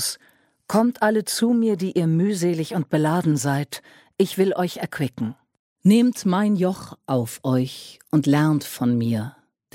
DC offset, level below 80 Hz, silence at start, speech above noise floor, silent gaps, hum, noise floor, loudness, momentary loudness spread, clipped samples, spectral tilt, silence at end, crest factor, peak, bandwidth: under 0.1%; -64 dBFS; 0 s; 38 dB; 5.59-5.76 s; none; -59 dBFS; -22 LUFS; 11 LU; under 0.1%; -6 dB/octave; 0.45 s; 16 dB; -6 dBFS; 16.5 kHz